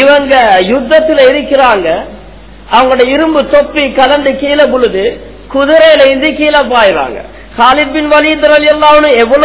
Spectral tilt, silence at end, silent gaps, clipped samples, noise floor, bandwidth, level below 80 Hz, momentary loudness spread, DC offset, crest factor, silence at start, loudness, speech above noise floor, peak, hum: -7.5 dB/octave; 0 s; none; 6%; -31 dBFS; 4 kHz; -34 dBFS; 9 LU; 0.9%; 8 dB; 0 s; -7 LUFS; 24 dB; 0 dBFS; none